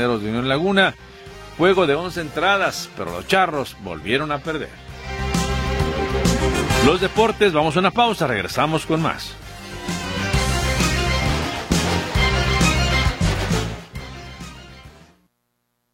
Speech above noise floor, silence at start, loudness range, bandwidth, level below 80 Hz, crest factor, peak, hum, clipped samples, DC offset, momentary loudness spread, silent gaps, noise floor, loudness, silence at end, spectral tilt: 53 dB; 0 s; 4 LU; 16.5 kHz; -30 dBFS; 18 dB; -2 dBFS; none; under 0.1%; under 0.1%; 17 LU; none; -72 dBFS; -20 LUFS; 1.05 s; -4.5 dB/octave